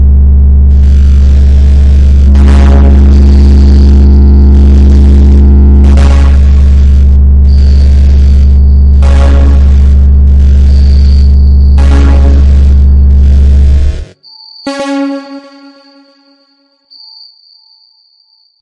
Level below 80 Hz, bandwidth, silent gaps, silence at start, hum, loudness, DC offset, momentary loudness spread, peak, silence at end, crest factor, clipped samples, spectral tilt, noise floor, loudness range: -4 dBFS; 5.4 kHz; none; 0 s; none; -5 LUFS; under 0.1%; 1 LU; 0 dBFS; 3.2 s; 4 dB; 0.2%; -8.5 dB/octave; -49 dBFS; 10 LU